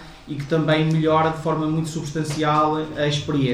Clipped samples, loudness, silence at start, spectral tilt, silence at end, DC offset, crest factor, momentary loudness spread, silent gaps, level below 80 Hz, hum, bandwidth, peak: under 0.1%; -21 LUFS; 0 s; -6 dB/octave; 0 s; under 0.1%; 14 dB; 8 LU; none; -48 dBFS; none; 12.5 kHz; -6 dBFS